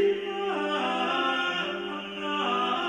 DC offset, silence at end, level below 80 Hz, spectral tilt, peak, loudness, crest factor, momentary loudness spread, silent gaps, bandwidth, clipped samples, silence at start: under 0.1%; 0 s; -68 dBFS; -4 dB/octave; -14 dBFS; -28 LUFS; 14 dB; 7 LU; none; 10 kHz; under 0.1%; 0 s